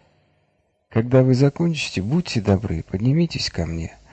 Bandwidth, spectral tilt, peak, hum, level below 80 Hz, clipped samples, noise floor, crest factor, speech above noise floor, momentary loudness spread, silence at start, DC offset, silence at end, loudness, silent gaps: 8.8 kHz; -6.5 dB/octave; -4 dBFS; none; -42 dBFS; under 0.1%; -67 dBFS; 18 dB; 47 dB; 10 LU; 0.9 s; under 0.1%; 0.2 s; -21 LUFS; none